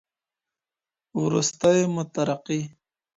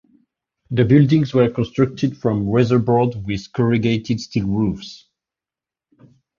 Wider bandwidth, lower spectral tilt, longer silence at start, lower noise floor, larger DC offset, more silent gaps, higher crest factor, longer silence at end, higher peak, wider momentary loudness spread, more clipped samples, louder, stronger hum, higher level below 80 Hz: first, 10 kHz vs 7.2 kHz; second, -5 dB/octave vs -8 dB/octave; first, 1.15 s vs 0.7 s; about the same, under -90 dBFS vs -89 dBFS; neither; neither; about the same, 20 dB vs 18 dB; second, 0.45 s vs 1.45 s; second, -6 dBFS vs -2 dBFS; about the same, 11 LU vs 10 LU; neither; second, -24 LUFS vs -18 LUFS; neither; second, -66 dBFS vs -46 dBFS